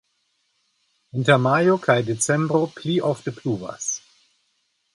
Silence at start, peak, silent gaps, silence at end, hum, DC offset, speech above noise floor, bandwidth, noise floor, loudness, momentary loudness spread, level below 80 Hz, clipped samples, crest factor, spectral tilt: 1.15 s; -2 dBFS; none; 0.95 s; none; under 0.1%; 50 dB; 11.5 kHz; -70 dBFS; -21 LUFS; 10 LU; -64 dBFS; under 0.1%; 20 dB; -5 dB/octave